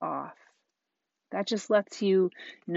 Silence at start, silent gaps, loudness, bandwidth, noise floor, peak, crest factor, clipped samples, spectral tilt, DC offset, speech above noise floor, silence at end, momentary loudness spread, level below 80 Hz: 0 s; none; -29 LUFS; 8 kHz; -85 dBFS; -10 dBFS; 20 dB; under 0.1%; -4.5 dB/octave; under 0.1%; 58 dB; 0 s; 15 LU; -84 dBFS